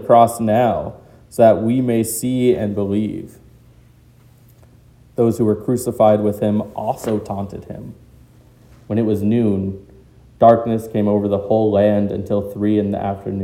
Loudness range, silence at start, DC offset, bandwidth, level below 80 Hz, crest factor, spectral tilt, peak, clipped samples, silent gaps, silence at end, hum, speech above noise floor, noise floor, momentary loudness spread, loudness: 6 LU; 0 s; under 0.1%; 16.5 kHz; -50 dBFS; 18 dB; -7 dB/octave; 0 dBFS; under 0.1%; none; 0 s; none; 32 dB; -48 dBFS; 16 LU; -17 LUFS